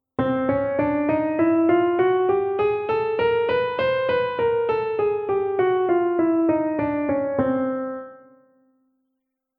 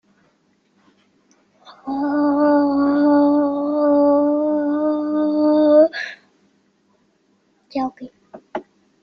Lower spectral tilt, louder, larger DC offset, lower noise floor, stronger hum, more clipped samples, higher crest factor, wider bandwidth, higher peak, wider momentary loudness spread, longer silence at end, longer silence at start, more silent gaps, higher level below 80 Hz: first, -9.5 dB/octave vs -7 dB/octave; second, -22 LUFS vs -17 LUFS; neither; first, -78 dBFS vs -62 dBFS; neither; neither; about the same, 16 dB vs 16 dB; second, 5.2 kHz vs 5.8 kHz; about the same, -6 dBFS vs -4 dBFS; second, 4 LU vs 18 LU; first, 1.45 s vs 0.4 s; second, 0.2 s vs 1.7 s; neither; first, -54 dBFS vs -66 dBFS